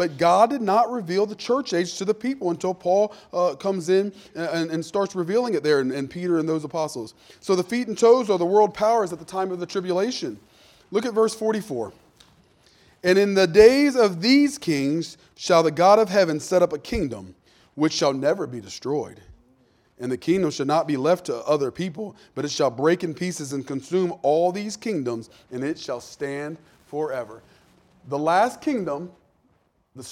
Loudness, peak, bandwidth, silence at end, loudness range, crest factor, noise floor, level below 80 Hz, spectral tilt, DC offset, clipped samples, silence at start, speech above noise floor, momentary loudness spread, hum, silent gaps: -22 LUFS; -2 dBFS; 15.5 kHz; 0 s; 8 LU; 22 dB; -65 dBFS; -54 dBFS; -5 dB/octave; under 0.1%; under 0.1%; 0 s; 43 dB; 14 LU; none; none